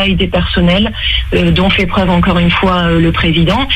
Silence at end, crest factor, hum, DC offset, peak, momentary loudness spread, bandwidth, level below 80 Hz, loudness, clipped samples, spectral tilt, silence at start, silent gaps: 0 s; 10 dB; none; under 0.1%; 0 dBFS; 2 LU; 9 kHz; -20 dBFS; -11 LUFS; under 0.1%; -7 dB/octave; 0 s; none